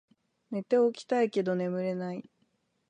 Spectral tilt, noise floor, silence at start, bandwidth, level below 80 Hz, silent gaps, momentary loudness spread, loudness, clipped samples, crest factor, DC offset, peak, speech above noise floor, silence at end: -7 dB/octave; -74 dBFS; 0.5 s; 9.8 kHz; -82 dBFS; none; 12 LU; -30 LUFS; under 0.1%; 16 dB; under 0.1%; -14 dBFS; 45 dB; 0.7 s